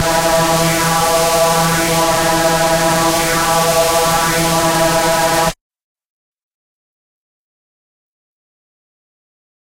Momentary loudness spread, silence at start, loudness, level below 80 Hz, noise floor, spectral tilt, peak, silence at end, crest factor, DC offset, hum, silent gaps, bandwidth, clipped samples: 1 LU; 0 s; -13 LUFS; -36 dBFS; under -90 dBFS; -3 dB/octave; -2 dBFS; 4.15 s; 14 dB; 0.2%; none; none; 16 kHz; under 0.1%